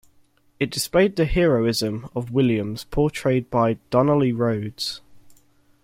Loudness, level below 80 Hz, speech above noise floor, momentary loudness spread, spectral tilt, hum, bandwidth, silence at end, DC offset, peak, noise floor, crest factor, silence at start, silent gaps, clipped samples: -22 LUFS; -40 dBFS; 38 dB; 9 LU; -6 dB/octave; none; 16.5 kHz; 0.5 s; under 0.1%; -4 dBFS; -59 dBFS; 18 dB; 0.6 s; none; under 0.1%